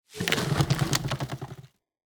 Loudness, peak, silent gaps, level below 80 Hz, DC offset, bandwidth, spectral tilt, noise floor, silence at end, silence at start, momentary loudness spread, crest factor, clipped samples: -27 LUFS; -6 dBFS; none; -48 dBFS; under 0.1%; over 20 kHz; -4.5 dB/octave; -48 dBFS; 0.45 s; 0.1 s; 16 LU; 24 dB; under 0.1%